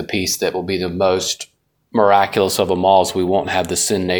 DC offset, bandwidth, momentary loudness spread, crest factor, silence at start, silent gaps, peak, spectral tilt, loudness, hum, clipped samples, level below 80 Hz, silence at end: under 0.1%; 19.5 kHz; 8 LU; 16 dB; 0 s; none; 0 dBFS; -3.5 dB/octave; -17 LUFS; none; under 0.1%; -50 dBFS; 0 s